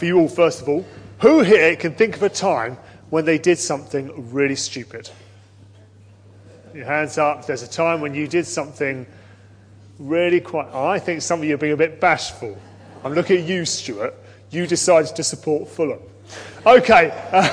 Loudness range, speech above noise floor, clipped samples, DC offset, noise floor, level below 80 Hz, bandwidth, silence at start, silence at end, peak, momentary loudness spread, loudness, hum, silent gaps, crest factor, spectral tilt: 8 LU; 28 dB; under 0.1%; under 0.1%; -47 dBFS; -58 dBFS; 10.5 kHz; 0 s; 0 s; 0 dBFS; 17 LU; -19 LUFS; none; none; 18 dB; -4.5 dB/octave